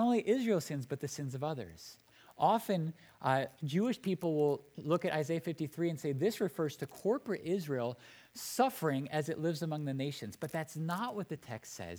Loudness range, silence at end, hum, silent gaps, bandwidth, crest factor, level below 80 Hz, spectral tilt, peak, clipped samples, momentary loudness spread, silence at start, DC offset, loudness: 2 LU; 0 s; none; none; over 20 kHz; 20 dB; -76 dBFS; -6 dB/octave; -16 dBFS; under 0.1%; 11 LU; 0 s; under 0.1%; -36 LUFS